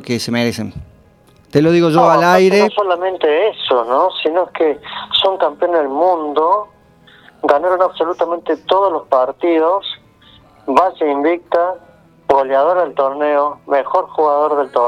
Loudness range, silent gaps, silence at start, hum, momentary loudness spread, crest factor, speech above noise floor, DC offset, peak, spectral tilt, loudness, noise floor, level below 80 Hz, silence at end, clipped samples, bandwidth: 4 LU; none; 0 s; none; 8 LU; 14 dB; 34 dB; under 0.1%; 0 dBFS; -5.5 dB/octave; -15 LUFS; -48 dBFS; -54 dBFS; 0 s; under 0.1%; 14 kHz